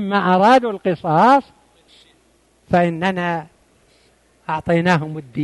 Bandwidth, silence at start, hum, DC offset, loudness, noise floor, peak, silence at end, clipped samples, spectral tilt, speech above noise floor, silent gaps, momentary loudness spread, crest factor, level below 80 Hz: 11.5 kHz; 0 s; none; under 0.1%; -17 LUFS; -57 dBFS; -4 dBFS; 0 s; under 0.1%; -7 dB/octave; 41 dB; none; 13 LU; 16 dB; -54 dBFS